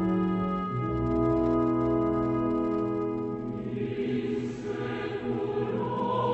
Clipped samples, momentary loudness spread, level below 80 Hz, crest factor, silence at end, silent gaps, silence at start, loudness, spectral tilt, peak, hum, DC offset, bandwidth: under 0.1%; 7 LU; -48 dBFS; 12 dB; 0 s; none; 0 s; -29 LUFS; -9 dB/octave; -16 dBFS; none; under 0.1%; 7.8 kHz